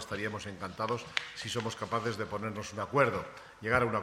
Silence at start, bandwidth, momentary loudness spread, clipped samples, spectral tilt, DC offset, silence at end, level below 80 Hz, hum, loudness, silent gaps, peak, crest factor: 0 s; 15.5 kHz; 11 LU; under 0.1%; -4.5 dB/octave; under 0.1%; 0 s; -60 dBFS; none; -34 LUFS; none; -8 dBFS; 26 dB